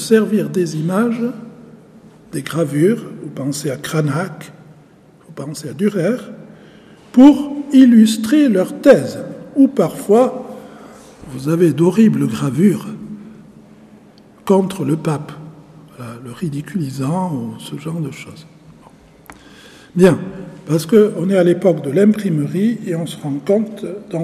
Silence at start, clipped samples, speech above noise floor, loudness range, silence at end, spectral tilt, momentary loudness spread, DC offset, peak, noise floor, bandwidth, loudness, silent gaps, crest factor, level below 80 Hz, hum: 0 s; under 0.1%; 32 dB; 11 LU; 0 s; -7 dB/octave; 20 LU; under 0.1%; 0 dBFS; -46 dBFS; 15 kHz; -15 LUFS; none; 16 dB; -56 dBFS; none